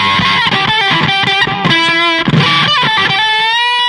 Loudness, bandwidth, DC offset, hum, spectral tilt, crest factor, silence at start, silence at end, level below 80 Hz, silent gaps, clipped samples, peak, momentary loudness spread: -9 LUFS; 12 kHz; under 0.1%; none; -4 dB/octave; 12 dB; 0 s; 0 s; -42 dBFS; none; under 0.1%; 0 dBFS; 1 LU